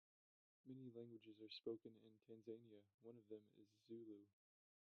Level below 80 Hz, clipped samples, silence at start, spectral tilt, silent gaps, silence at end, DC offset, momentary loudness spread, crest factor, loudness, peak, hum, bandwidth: under -90 dBFS; under 0.1%; 0.65 s; -5.5 dB/octave; 2.94-2.98 s; 0.6 s; under 0.1%; 12 LU; 22 dB; -60 LUFS; -38 dBFS; none; 6.4 kHz